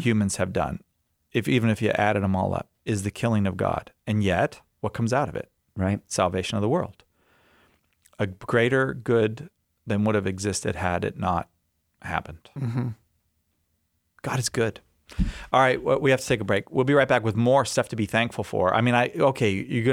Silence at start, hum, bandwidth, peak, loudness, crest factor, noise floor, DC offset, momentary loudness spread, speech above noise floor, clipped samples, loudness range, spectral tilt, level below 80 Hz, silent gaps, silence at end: 0 s; none; 16 kHz; -6 dBFS; -25 LUFS; 18 dB; -73 dBFS; under 0.1%; 10 LU; 49 dB; under 0.1%; 9 LU; -5.5 dB/octave; -46 dBFS; none; 0 s